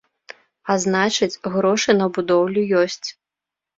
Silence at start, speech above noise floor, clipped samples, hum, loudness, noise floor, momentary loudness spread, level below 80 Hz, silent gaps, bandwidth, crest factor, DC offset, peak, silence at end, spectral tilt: 0.65 s; 68 dB; under 0.1%; none; -19 LUFS; -87 dBFS; 8 LU; -62 dBFS; none; 7.8 kHz; 18 dB; under 0.1%; -4 dBFS; 0.65 s; -4 dB/octave